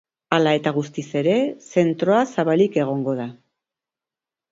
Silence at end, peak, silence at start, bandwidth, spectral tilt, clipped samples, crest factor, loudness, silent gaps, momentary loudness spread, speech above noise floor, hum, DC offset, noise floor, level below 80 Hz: 1.2 s; -2 dBFS; 0.3 s; 7.8 kHz; -6.5 dB/octave; under 0.1%; 20 dB; -21 LUFS; none; 8 LU; 69 dB; none; under 0.1%; -89 dBFS; -66 dBFS